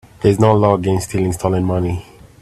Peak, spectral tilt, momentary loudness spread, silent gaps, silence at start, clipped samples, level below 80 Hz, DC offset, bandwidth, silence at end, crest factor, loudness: 0 dBFS; -7 dB/octave; 8 LU; none; 0.2 s; under 0.1%; -42 dBFS; under 0.1%; 13.5 kHz; 0.4 s; 16 dB; -16 LUFS